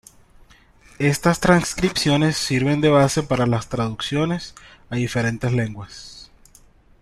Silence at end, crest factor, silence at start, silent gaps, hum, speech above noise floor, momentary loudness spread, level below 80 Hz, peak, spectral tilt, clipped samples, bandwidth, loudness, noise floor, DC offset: 0.8 s; 20 dB; 1 s; none; none; 31 dB; 13 LU; -44 dBFS; -2 dBFS; -5 dB/octave; under 0.1%; 15 kHz; -20 LUFS; -51 dBFS; under 0.1%